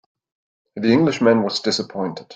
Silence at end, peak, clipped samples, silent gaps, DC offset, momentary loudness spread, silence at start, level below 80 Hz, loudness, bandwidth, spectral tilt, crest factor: 0 s; -4 dBFS; under 0.1%; none; under 0.1%; 11 LU; 0.75 s; -60 dBFS; -19 LUFS; 9 kHz; -5.5 dB/octave; 16 dB